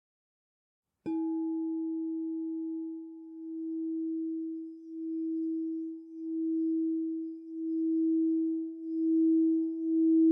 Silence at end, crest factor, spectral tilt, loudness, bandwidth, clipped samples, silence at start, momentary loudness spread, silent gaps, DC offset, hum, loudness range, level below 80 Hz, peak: 0 s; 12 dB; -10.5 dB/octave; -32 LUFS; 2.5 kHz; under 0.1%; 1.05 s; 14 LU; none; under 0.1%; none; 7 LU; under -90 dBFS; -18 dBFS